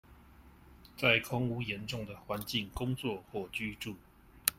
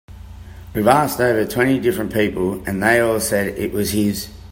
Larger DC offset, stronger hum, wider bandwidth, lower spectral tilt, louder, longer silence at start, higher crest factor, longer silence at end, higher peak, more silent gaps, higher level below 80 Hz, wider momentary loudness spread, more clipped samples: neither; neither; about the same, 16.5 kHz vs 16.5 kHz; about the same, -4 dB/octave vs -5 dB/octave; second, -35 LUFS vs -18 LUFS; about the same, 0.1 s vs 0.1 s; first, 30 dB vs 18 dB; about the same, 0.05 s vs 0 s; second, -6 dBFS vs 0 dBFS; neither; second, -56 dBFS vs -42 dBFS; first, 15 LU vs 12 LU; neither